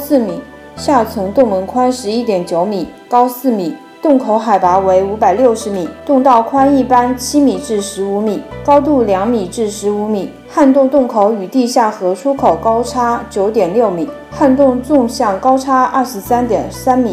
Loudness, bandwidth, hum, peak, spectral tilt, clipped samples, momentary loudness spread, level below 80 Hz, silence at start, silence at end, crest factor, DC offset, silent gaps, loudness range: -13 LUFS; 16 kHz; none; 0 dBFS; -5.5 dB/octave; 0.3%; 8 LU; -42 dBFS; 0 s; 0 s; 12 dB; under 0.1%; none; 3 LU